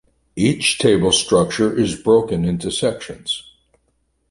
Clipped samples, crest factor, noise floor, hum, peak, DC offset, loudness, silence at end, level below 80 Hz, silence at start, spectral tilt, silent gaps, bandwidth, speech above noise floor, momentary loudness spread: under 0.1%; 16 dB; -66 dBFS; none; -2 dBFS; under 0.1%; -18 LUFS; 0.9 s; -44 dBFS; 0.35 s; -4.5 dB/octave; none; 11.5 kHz; 49 dB; 10 LU